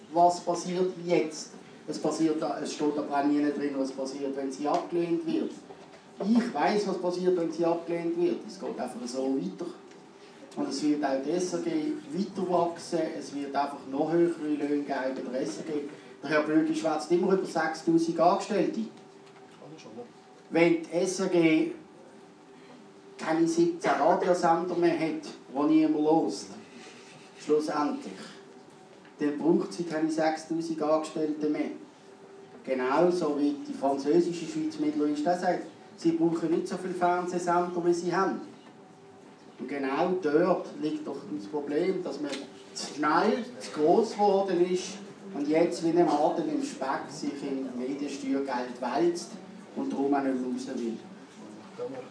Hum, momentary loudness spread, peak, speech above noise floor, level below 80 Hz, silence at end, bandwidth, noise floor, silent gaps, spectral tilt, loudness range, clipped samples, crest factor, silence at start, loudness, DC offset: none; 15 LU; -8 dBFS; 24 dB; -86 dBFS; 0 s; 11 kHz; -52 dBFS; none; -5.5 dB/octave; 4 LU; under 0.1%; 20 dB; 0 s; -29 LUFS; under 0.1%